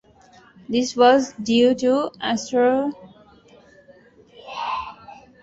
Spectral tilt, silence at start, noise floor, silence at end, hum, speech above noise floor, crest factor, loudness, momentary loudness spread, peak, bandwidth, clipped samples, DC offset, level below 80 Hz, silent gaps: -4 dB/octave; 0.7 s; -51 dBFS; 0.3 s; none; 33 dB; 20 dB; -20 LUFS; 15 LU; -4 dBFS; 8 kHz; under 0.1%; under 0.1%; -60 dBFS; none